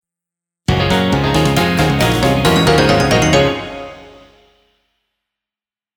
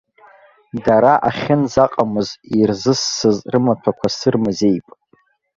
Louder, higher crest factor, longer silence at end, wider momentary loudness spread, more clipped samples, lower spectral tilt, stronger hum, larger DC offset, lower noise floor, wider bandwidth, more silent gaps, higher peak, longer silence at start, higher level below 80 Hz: first, -13 LUFS vs -17 LUFS; about the same, 16 dB vs 16 dB; first, 1.9 s vs 0.75 s; first, 13 LU vs 7 LU; neither; about the same, -5 dB/octave vs -5.5 dB/octave; neither; neither; first, under -90 dBFS vs -58 dBFS; first, over 20 kHz vs 7.8 kHz; neither; about the same, 0 dBFS vs 0 dBFS; about the same, 0.7 s vs 0.75 s; first, -30 dBFS vs -50 dBFS